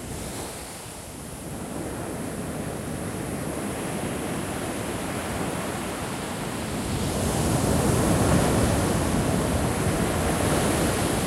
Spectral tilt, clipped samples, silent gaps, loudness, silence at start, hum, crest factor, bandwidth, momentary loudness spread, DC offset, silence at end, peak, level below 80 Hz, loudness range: -5 dB/octave; under 0.1%; none; -26 LUFS; 0 s; none; 16 dB; 16 kHz; 12 LU; under 0.1%; 0 s; -10 dBFS; -38 dBFS; 9 LU